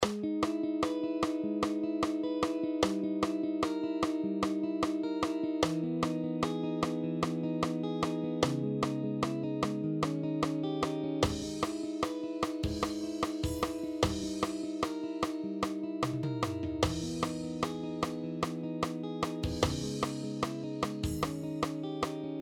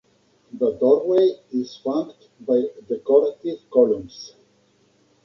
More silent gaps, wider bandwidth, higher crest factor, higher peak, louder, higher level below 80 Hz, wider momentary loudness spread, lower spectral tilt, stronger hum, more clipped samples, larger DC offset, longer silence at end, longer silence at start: neither; first, 16 kHz vs 6.8 kHz; about the same, 22 dB vs 18 dB; second, -10 dBFS vs -4 dBFS; second, -34 LUFS vs -21 LUFS; first, -52 dBFS vs -64 dBFS; second, 4 LU vs 18 LU; second, -5.5 dB/octave vs -7 dB/octave; neither; neither; neither; second, 0 s vs 0.95 s; second, 0 s vs 0.55 s